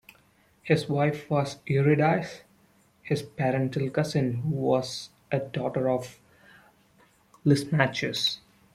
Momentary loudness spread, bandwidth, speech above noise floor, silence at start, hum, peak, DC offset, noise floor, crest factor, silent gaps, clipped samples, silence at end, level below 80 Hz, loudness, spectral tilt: 13 LU; 14.5 kHz; 36 dB; 0.65 s; none; -6 dBFS; under 0.1%; -62 dBFS; 22 dB; none; under 0.1%; 0.35 s; -64 dBFS; -27 LUFS; -6 dB/octave